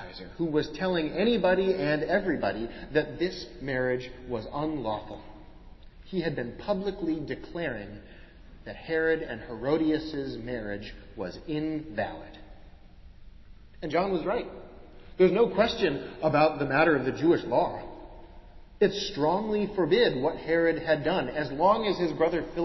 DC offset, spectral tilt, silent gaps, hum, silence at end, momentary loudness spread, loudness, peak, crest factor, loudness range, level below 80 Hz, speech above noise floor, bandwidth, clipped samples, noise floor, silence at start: under 0.1%; -6.5 dB/octave; none; none; 0 s; 15 LU; -28 LUFS; -8 dBFS; 20 dB; 8 LU; -50 dBFS; 22 dB; 6.2 kHz; under 0.1%; -49 dBFS; 0 s